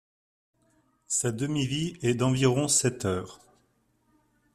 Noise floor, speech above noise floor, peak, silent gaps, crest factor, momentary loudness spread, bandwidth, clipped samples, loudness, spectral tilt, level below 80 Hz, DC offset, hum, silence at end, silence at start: -70 dBFS; 43 dB; -10 dBFS; none; 20 dB; 8 LU; 14.5 kHz; under 0.1%; -27 LUFS; -4.5 dB/octave; -60 dBFS; under 0.1%; none; 1.2 s; 1.1 s